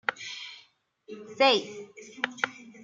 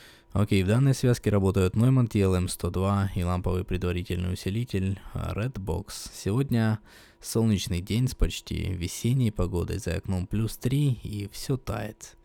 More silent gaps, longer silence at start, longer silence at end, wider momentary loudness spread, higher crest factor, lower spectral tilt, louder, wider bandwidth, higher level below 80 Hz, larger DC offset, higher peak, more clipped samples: neither; about the same, 0.1 s vs 0 s; first, 0.3 s vs 0.15 s; first, 23 LU vs 10 LU; first, 24 dB vs 16 dB; second, -2 dB/octave vs -6.5 dB/octave; about the same, -28 LUFS vs -27 LUFS; second, 7.6 kHz vs 17.5 kHz; second, -82 dBFS vs -40 dBFS; neither; about the same, -8 dBFS vs -10 dBFS; neither